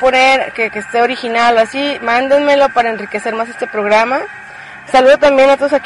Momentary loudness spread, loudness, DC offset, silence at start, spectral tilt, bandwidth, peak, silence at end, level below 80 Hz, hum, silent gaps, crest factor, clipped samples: 11 LU; -12 LUFS; under 0.1%; 0 s; -3.5 dB/octave; 11.5 kHz; 0 dBFS; 0 s; -48 dBFS; none; none; 12 dB; under 0.1%